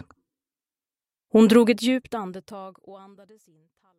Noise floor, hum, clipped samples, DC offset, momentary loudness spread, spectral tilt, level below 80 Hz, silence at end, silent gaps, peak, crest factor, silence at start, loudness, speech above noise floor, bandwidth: under -90 dBFS; none; under 0.1%; under 0.1%; 24 LU; -5.5 dB/octave; -68 dBFS; 1.05 s; none; -4 dBFS; 20 dB; 1.35 s; -20 LUFS; over 67 dB; 13.5 kHz